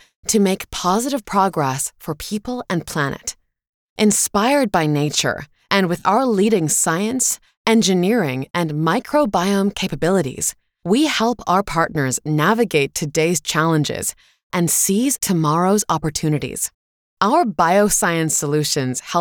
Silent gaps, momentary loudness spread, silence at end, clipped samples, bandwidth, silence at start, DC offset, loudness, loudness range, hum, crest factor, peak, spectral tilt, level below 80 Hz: 3.69-3.96 s, 7.57-7.65 s, 14.43-14.50 s, 16.74-17.17 s; 8 LU; 0 s; under 0.1%; over 20 kHz; 0.25 s; under 0.1%; -18 LUFS; 3 LU; none; 18 dB; -2 dBFS; -4 dB/octave; -48 dBFS